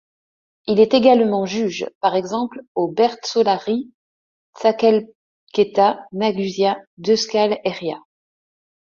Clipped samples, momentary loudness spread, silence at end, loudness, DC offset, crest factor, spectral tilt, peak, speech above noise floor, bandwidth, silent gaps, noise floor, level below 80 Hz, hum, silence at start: under 0.1%; 11 LU; 1 s; -19 LUFS; under 0.1%; 18 dB; -5 dB/octave; -2 dBFS; over 72 dB; 7.4 kHz; 1.95-2.01 s, 2.68-2.75 s, 3.94-4.53 s, 5.15-5.47 s, 6.87-6.97 s; under -90 dBFS; -64 dBFS; none; 0.65 s